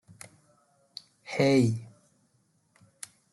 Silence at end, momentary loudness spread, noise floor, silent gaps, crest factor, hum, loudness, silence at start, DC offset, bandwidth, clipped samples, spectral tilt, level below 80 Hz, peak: 1.45 s; 26 LU; -70 dBFS; none; 20 dB; none; -26 LUFS; 1.25 s; under 0.1%; 12 kHz; under 0.1%; -6 dB/octave; -70 dBFS; -12 dBFS